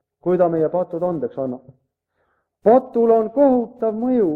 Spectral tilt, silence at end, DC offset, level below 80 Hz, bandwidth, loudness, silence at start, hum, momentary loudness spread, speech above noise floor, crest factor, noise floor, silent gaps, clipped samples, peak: -11 dB/octave; 0 s; under 0.1%; -60 dBFS; 4.1 kHz; -19 LUFS; 0.25 s; none; 10 LU; 52 dB; 16 dB; -69 dBFS; none; under 0.1%; -2 dBFS